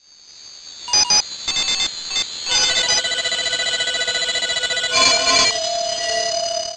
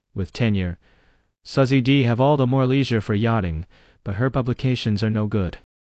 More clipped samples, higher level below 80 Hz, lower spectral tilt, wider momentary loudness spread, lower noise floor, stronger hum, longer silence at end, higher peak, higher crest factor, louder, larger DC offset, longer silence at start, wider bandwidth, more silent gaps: neither; second, -50 dBFS vs -40 dBFS; second, 1 dB/octave vs -8 dB/octave; second, 8 LU vs 13 LU; second, -43 dBFS vs -60 dBFS; neither; second, 0 s vs 0.35 s; first, -2 dBFS vs -6 dBFS; about the same, 18 dB vs 16 dB; first, -17 LUFS vs -21 LUFS; neither; first, 0.3 s vs 0.15 s; first, 11 kHz vs 8 kHz; neither